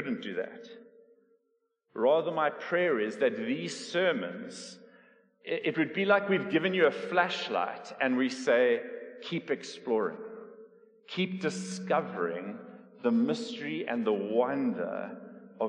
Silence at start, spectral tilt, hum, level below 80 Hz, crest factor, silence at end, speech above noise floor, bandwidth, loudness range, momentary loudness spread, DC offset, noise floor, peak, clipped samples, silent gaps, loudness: 0 s; -5 dB/octave; none; -88 dBFS; 20 dB; 0 s; 47 dB; 10.5 kHz; 5 LU; 17 LU; under 0.1%; -77 dBFS; -12 dBFS; under 0.1%; none; -30 LUFS